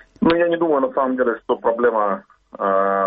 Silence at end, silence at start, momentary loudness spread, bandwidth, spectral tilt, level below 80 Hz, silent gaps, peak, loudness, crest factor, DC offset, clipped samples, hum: 0 s; 0.2 s; 5 LU; 4.9 kHz; -9 dB/octave; -54 dBFS; none; -4 dBFS; -19 LUFS; 14 dB; under 0.1%; under 0.1%; none